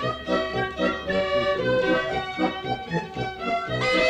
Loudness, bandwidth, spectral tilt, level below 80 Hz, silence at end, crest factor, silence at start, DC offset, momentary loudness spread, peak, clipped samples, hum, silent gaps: -25 LUFS; 10 kHz; -5.5 dB/octave; -48 dBFS; 0 s; 14 dB; 0 s; under 0.1%; 6 LU; -12 dBFS; under 0.1%; none; none